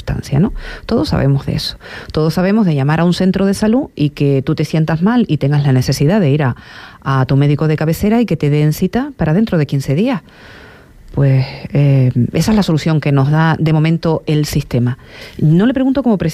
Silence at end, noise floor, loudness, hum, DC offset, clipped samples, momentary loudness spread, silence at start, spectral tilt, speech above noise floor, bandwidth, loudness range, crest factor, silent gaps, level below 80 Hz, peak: 0 s; -38 dBFS; -14 LUFS; none; under 0.1%; under 0.1%; 6 LU; 0 s; -7.5 dB/octave; 25 dB; 14.5 kHz; 2 LU; 10 dB; none; -36 dBFS; -4 dBFS